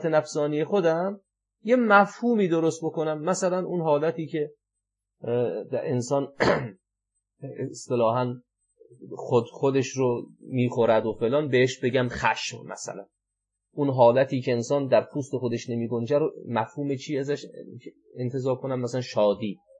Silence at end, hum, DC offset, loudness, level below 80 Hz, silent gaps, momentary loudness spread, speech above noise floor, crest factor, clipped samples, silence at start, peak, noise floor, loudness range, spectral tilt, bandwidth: 0.25 s; none; under 0.1%; -25 LUFS; -64 dBFS; none; 14 LU; 60 dB; 22 dB; under 0.1%; 0 s; -4 dBFS; -85 dBFS; 5 LU; -6 dB/octave; 10.5 kHz